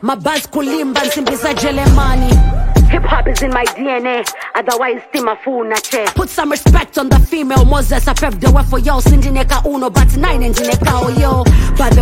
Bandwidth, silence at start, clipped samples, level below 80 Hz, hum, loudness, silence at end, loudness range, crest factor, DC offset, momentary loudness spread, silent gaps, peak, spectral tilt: 16.5 kHz; 0 s; under 0.1%; -14 dBFS; none; -13 LUFS; 0 s; 3 LU; 10 dB; under 0.1%; 5 LU; none; 0 dBFS; -5.5 dB/octave